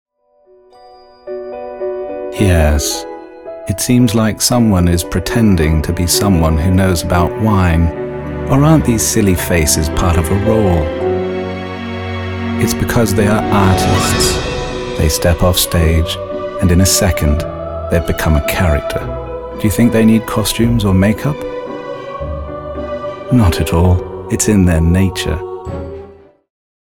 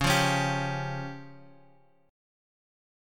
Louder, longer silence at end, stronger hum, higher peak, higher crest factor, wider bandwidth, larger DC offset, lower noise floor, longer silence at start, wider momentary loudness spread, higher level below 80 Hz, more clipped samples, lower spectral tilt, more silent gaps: first, -14 LUFS vs -28 LUFS; second, 0.7 s vs 1 s; neither; first, 0 dBFS vs -12 dBFS; second, 14 dB vs 20 dB; about the same, 18.5 kHz vs 17 kHz; neither; second, -51 dBFS vs -62 dBFS; first, 0.85 s vs 0 s; second, 13 LU vs 21 LU; first, -24 dBFS vs -52 dBFS; neither; about the same, -5 dB/octave vs -4 dB/octave; neither